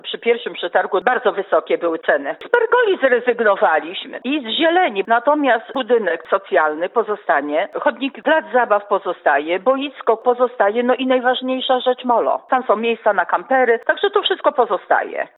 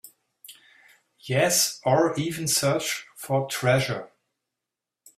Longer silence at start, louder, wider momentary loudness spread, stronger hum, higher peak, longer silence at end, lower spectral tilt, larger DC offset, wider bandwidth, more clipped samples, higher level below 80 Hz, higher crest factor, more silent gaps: about the same, 0.05 s vs 0.05 s; first, -17 LUFS vs -24 LUFS; second, 5 LU vs 9 LU; neither; first, -2 dBFS vs -6 dBFS; second, 0.1 s vs 1.1 s; first, -6.5 dB/octave vs -3.5 dB/octave; neither; second, 4.1 kHz vs 16 kHz; neither; second, -80 dBFS vs -64 dBFS; about the same, 16 dB vs 20 dB; neither